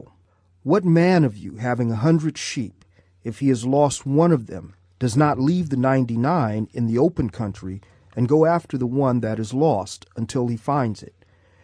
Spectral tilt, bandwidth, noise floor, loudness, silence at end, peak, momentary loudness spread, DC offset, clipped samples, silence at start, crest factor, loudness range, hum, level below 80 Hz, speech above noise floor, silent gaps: -7 dB/octave; 11 kHz; -59 dBFS; -21 LUFS; 0.6 s; -4 dBFS; 15 LU; under 0.1%; under 0.1%; 0.65 s; 16 dB; 2 LU; none; -52 dBFS; 39 dB; none